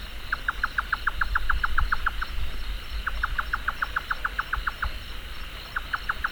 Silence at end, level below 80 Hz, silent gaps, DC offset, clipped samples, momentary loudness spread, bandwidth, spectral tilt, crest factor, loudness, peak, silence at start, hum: 0 s; -32 dBFS; none; under 0.1%; under 0.1%; 9 LU; over 20 kHz; -3.5 dB/octave; 18 dB; -29 LUFS; -10 dBFS; 0 s; none